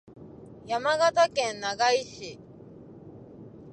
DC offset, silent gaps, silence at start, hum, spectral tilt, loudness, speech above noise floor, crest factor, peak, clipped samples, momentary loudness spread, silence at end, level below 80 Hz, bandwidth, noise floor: under 0.1%; none; 0.15 s; none; -2.5 dB/octave; -25 LUFS; 22 dB; 18 dB; -10 dBFS; under 0.1%; 25 LU; 0 s; -64 dBFS; 11 kHz; -48 dBFS